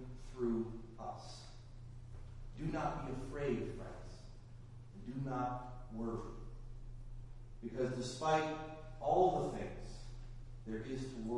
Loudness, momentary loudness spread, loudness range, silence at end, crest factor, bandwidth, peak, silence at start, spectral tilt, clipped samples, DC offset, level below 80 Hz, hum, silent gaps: -41 LUFS; 20 LU; 8 LU; 0 s; 22 dB; 11.5 kHz; -20 dBFS; 0 s; -6.5 dB/octave; under 0.1%; under 0.1%; -52 dBFS; none; none